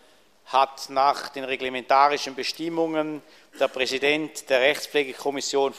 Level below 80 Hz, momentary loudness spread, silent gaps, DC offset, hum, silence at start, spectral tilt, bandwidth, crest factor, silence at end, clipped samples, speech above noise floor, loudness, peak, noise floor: -68 dBFS; 8 LU; none; under 0.1%; none; 0.5 s; -2.5 dB/octave; 15 kHz; 20 dB; 0 s; under 0.1%; 30 dB; -24 LUFS; -4 dBFS; -55 dBFS